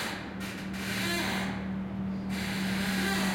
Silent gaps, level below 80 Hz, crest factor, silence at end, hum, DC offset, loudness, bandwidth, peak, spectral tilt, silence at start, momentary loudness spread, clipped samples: none; -52 dBFS; 14 dB; 0 s; none; under 0.1%; -32 LUFS; 16.5 kHz; -18 dBFS; -4.5 dB/octave; 0 s; 8 LU; under 0.1%